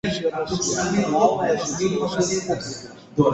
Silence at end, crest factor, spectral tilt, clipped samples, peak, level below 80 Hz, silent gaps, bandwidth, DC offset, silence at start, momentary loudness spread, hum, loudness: 0 s; 18 dB; -4.5 dB/octave; under 0.1%; -4 dBFS; -50 dBFS; none; 8.4 kHz; under 0.1%; 0.05 s; 9 LU; none; -22 LUFS